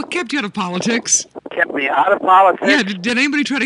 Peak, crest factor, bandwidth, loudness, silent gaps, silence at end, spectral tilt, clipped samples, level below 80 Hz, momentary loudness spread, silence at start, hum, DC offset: 0 dBFS; 16 dB; 11.5 kHz; -15 LUFS; none; 0 s; -2.5 dB/octave; under 0.1%; -64 dBFS; 9 LU; 0 s; none; under 0.1%